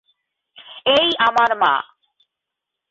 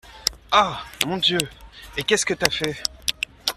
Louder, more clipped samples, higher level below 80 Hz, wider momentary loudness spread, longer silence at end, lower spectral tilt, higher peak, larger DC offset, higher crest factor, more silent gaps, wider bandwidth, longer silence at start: first, -17 LUFS vs -22 LUFS; neither; second, -60 dBFS vs -48 dBFS; first, 17 LU vs 7 LU; first, 1.05 s vs 0.05 s; about the same, -3 dB/octave vs -2 dB/octave; second, -4 dBFS vs 0 dBFS; neither; second, 16 dB vs 24 dB; neither; second, 7.8 kHz vs 15.5 kHz; first, 0.7 s vs 0.05 s